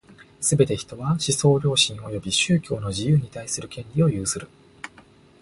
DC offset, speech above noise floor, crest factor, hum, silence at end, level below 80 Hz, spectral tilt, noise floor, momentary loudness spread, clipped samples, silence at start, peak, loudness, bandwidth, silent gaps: under 0.1%; 29 dB; 20 dB; none; 0.55 s; -50 dBFS; -4.5 dB/octave; -52 dBFS; 12 LU; under 0.1%; 0.1 s; -4 dBFS; -22 LUFS; 11.5 kHz; none